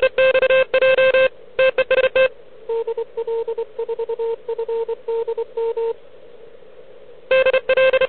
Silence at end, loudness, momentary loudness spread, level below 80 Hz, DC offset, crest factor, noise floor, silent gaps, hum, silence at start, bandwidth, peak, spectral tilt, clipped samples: 0 s; -19 LUFS; 12 LU; -56 dBFS; 0.9%; 14 dB; -44 dBFS; none; none; 0 s; 4.5 kHz; -4 dBFS; -7.5 dB/octave; under 0.1%